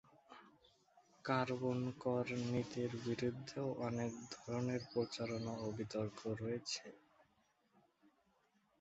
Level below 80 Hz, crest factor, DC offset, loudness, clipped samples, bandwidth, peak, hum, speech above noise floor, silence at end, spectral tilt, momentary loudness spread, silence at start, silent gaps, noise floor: -74 dBFS; 22 dB; under 0.1%; -42 LUFS; under 0.1%; 8 kHz; -22 dBFS; none; 36 dB; 1.8 s; -5.5 dB/octave; 10 LU; 0.3 s; none; -78 dBFS